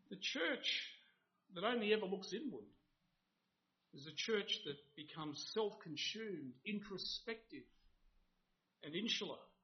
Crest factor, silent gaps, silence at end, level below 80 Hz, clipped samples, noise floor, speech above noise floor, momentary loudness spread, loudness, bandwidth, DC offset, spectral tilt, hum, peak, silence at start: 24 dB; none; 0.15 s; -80 dBFS; under 0.1%; -86 dBFS; 42 dB; 15 LU; -43 LUFS; 6.4 kHz; under 0.1%; -1.5 dB/octave; none; -22 dBFS; 0.1 s